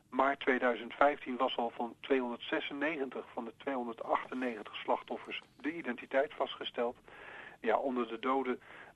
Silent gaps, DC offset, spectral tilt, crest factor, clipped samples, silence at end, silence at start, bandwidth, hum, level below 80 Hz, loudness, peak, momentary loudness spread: none; under 0.1%; -5 dB/octave; 22 dB; under 0.1%; 0.05 s; 0.1 s; 11.5 kHz; none; -74 dBFS; -35 LUFS; -12 dBFS; 11 LU